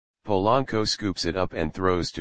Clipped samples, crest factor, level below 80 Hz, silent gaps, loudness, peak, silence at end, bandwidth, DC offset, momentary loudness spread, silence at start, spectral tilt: under 0.1%; 18 dB; -46 dBFS; none; -25 LUFS; -6 dBFS; 0 s; 10 kHz; 1%; 5 LU; 0.15 s; -5 dB/octave